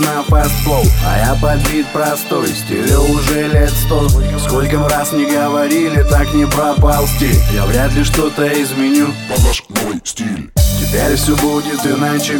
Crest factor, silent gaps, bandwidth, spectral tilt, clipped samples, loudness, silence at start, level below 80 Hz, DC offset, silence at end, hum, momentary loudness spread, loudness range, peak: 12 dB; none; over 20 kHz; -5 dB/octave; under 0.1%; -14 LUFS; 0 s; -18 dBFS; under 0.1%; 0 s; none; 4 LU; 2 LU; 0 dBFS